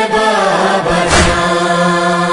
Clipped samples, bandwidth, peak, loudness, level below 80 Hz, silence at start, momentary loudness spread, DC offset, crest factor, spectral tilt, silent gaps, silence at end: under 0.1%; 11 kHz; 0 dBFS; -11 LUFS; -28 dBFS; 0 s; 3 LU; under 0.1%; 12 dB; -4 dB/octave; none; 0 s